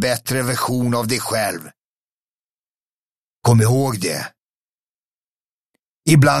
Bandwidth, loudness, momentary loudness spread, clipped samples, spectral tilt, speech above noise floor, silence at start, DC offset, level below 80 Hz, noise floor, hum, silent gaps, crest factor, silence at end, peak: 15.5 kHz; -18 LUFS; 11 LU; under 0.1%; -5 dB/octave; over 73 dB; 0 s; under 0.1%; -52 dBFS; under -90 dBFS; none; 1.84-3.42 s, 4.42-5.73 s, 5.87-6.03 s; 18 dB; 0 s; -2 dBFS